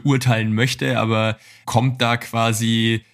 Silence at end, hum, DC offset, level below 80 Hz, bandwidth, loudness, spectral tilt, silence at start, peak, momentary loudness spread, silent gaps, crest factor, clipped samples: 0.15 s; none; under 0.1%; -54 dBFS; 15.5 kHz; -19 LUFS; -5 dB/octave; 0.05 s; -2 dBFS; 3 LU; none; 18 dB; under 0.1%